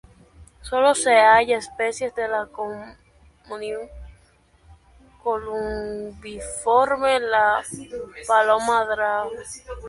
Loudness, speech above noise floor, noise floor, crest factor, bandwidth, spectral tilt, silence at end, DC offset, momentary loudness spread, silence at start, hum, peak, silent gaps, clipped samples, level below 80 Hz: -21 LUFS; 36 dB; -57 dBFS; 20 dB; 11.5 kHz; -2.5 dB/octave; 0 s; under 0.1%; 19 LU; 0.4 s; none; -2 dBFS; none; under 0.1%; -48 dBFS